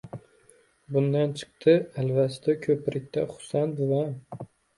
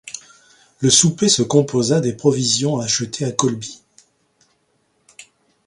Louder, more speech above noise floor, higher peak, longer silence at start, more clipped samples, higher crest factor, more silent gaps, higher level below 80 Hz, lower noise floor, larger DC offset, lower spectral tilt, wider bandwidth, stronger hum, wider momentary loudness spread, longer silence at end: second, -26 LUFS vs -17 LUFS; second, 35 dB vs 47 dB; second, -8 dBFS vs 0 dBFS; about the same, 0.05 s vs 0.05 s; neither; about the same, 18 dB vs 20 dB; neither; second, -66 dBFS vs -56 dBFS; second, -60 dBFS vs -65 dBFS; neither; first, -7.5 dB/octave vs -4 dB/octave; about the same, 11.5 kHz vs 11.5 kHz; neither; first, 18 LU vs 14 LU; about the same, 0.35 s vs 0.45 s